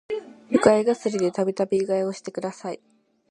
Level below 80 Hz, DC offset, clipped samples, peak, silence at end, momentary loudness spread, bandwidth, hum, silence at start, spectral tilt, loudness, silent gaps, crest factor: -62 dBFS; under 0.1%; under 0.1%; -2 dBFS; 0.55 s; 15 LU; 11 kHz; none; 0.1 s; -5.5 dB/octave; -23 LUFS; none; 22 dB